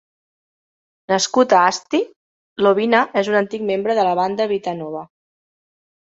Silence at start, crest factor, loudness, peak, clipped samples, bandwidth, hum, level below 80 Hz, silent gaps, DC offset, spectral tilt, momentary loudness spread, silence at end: 1.1 s; 18 dB; -18 LUFS; -2 dBFS; under 0.1%; 8 kHz; none; -66 dBFS; 2.16-2.56 s; under 0.1%; -4 dB/octave; 14 LU; 1.1 s